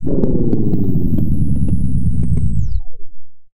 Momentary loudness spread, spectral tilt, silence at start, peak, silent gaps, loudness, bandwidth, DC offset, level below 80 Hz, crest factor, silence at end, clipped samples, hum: 3 LU; -11.5 dB/octave; 0 s; 0 dBFS; none; -18 LUFS; 1.3 kHz; under 0.1%; -22 dBFS; 12 dB; 0.05 s; under 0.1%; none